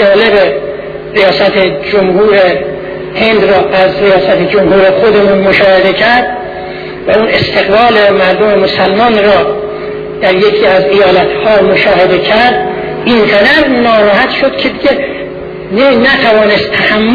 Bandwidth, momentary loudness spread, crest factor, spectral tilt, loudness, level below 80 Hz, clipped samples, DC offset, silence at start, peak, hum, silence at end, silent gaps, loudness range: 5.4 kHz; 11 LU; 8 dB; -7 dB/octave; -7 LUFS; -36 dBFS; 0.3%; under 0.1%; 0 s; 0 dBFS; none; 0 s; none; 2 LU